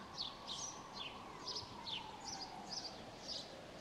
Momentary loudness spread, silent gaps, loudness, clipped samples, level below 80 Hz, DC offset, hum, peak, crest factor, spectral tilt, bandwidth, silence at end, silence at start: 4 LU; none; -46 LUFS; under 0.1%; -70 dBFS; under 0.1%; none; -30 dBFS; 18 dB; -2 dB/octave; 15.5 kHz; 0 s; 0 s